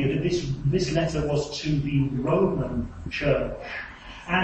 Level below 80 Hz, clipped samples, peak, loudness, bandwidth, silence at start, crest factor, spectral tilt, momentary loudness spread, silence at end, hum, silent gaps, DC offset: -40 dBFS; under 0.1%; -8 dBFS; -26 LUFS; 8.6 kHz; 0 s; 16 dB; -6.5 dB/octave; 11 LU; 0 s; none; none; under 0.1%